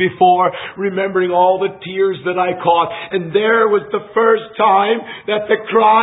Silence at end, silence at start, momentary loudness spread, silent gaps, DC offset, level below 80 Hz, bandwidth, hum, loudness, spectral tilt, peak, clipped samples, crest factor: 0 s; 0 s; 8 LU; none; under 0.1%; -60 dBFS; 4 kHz; none; -15 LUFS; -10.5 dB/octave; 0 dBFS; under 0.1%; 14 dB